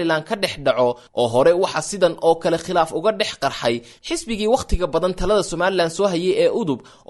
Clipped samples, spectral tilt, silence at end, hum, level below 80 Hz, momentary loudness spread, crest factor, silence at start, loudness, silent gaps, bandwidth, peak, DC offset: under 0.1%; -4.5 dB/octave; 0.3 s; none; -36 dBFS; 7 LU; 16 dB; 0 s; -20 LUFS; none; 12 kHz; -4 dBFS; under 0.1%